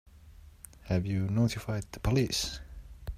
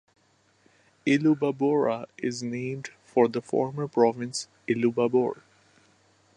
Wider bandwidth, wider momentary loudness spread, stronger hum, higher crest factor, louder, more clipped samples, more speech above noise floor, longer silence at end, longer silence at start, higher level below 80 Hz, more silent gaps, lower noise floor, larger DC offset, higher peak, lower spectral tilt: first, 15.5 kHz vs 11 kHz; first, 22 LU vs 9 LU; neither; about the same, 18 dB vs 18 dB; second, -31 LUFS vs -26 LUFS; neither; second, 23 dB vs 40 dB; second, 0 s vs 1.05 s; second, 0.15 s vs 1.05 s; first, -46 dBFS vs -74 dBFS; neither; second, -53 dBFS vs -65 dBFS; neither; second, -16 dBFS vs -8 dBFS; about the same, -5.5 dB/octave vs -6 dB/octave